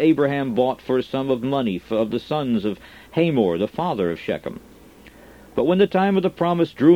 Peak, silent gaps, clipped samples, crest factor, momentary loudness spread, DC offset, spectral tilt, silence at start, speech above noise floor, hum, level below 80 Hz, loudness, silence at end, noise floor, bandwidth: -4 dBFS; none; under 0.1%; 18 dB; 10 LU; under 0.1%; -8 dB/octave; 0 s; 26 dB; none; -54 dBFS; -22 LUFS; 0 s; -46 dBFS; 16 kHz